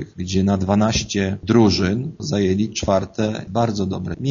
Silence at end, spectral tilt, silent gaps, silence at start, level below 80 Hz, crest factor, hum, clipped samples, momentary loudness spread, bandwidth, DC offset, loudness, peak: 0 s; -6 dB/octave; none; 0 s; -42 dBFS; 18 dB; none; under 0.1%; 8 LU; 7.4 kHz; under 0.1%; -20 LUFS; -2 dBFS